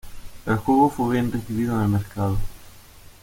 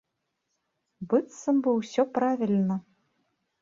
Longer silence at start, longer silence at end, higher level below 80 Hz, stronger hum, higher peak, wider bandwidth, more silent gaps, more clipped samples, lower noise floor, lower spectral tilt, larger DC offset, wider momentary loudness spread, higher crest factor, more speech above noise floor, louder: second, 0.05 s vs 1 s; second, 0.25 s vs 0.8 s; first, -38 dBFS vs -74 dBFS; neither; first, -6 dBFS vs -10 dBFS; first, 17 kHz vs 7.8 kHz; neither; neither; second, -46 dBFS vs -80 dBFS; about the same, -7.5 dB/octave vs -7 dB/octave; neither; first, 11 LU vs 5 LU; about the same, 16 dB vs 18 dB; second, 24 dB vs 55 dB; first, -23 LUFS vs -27 LUFS